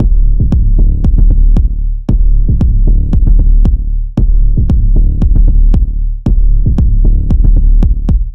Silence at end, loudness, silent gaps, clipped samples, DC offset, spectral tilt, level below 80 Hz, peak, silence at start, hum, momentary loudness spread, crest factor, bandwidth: 0 s; -12 LUFS; none; 0.1%; under 0.1%; -11 dB/octave; -8 dBFS; 0 dBFS; 0 s; none; 4 LU; 6 dB; 1.2 kHz